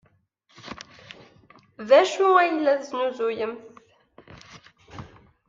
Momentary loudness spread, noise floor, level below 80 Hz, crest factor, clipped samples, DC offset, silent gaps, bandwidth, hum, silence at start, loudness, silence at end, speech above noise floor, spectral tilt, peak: 25 LU; -64 dBFS; -66 dBFS; 20 dB; under 0.1%; under 0.1%; none; 7.6 kHz; none; 0.65 s; -21 LUFS; 0.4 s; 43 dB; -4 dB/octave; -6 dBFS